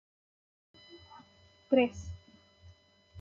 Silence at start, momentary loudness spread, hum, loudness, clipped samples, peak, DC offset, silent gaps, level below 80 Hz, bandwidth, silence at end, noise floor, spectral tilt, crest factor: 0.95 s; 27 LU; none; -30 LUFS; under 0.1%; -14 dBFS; under 0.1%; none; -64 dBFS; 7.4 kHz; 0 s; -62 dBFS; -6 dB/octave; 24 dB